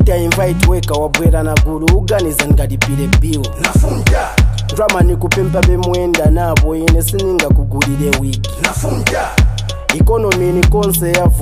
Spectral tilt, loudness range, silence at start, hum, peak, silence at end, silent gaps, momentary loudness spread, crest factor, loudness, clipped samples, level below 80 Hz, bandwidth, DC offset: -5 dB/octave; 1 LU; 0 s; none; 0 dBFS; 0 s; none; 4 LU; 12 dB; -13 LUFS; under 0.1%; -16 dBFS; 16 kHz; under 0.1%